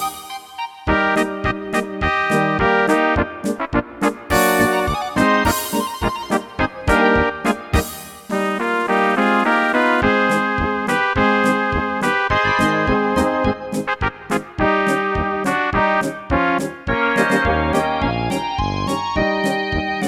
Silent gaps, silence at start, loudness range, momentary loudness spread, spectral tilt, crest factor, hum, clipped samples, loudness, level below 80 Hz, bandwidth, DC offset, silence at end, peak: none; 0 s; 2 LU; 7 LU; -5 dB/octave; 18 dB; none; under 0.1%; -18 LUFS; -34 dBFS; 19 kHz; under 0.1%; 0 s; 0 dBFS